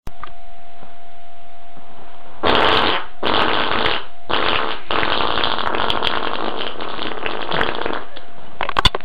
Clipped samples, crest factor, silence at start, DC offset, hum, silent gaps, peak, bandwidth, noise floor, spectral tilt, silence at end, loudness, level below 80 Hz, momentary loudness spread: under 0.1%; 20 dB; 0 s; 10%; none; none; 0 dBFS; 16 kHz; -44 dBFS; -4.5 dB/octave; 0 s; -19 LUFS; -38 dBFS; 11 LU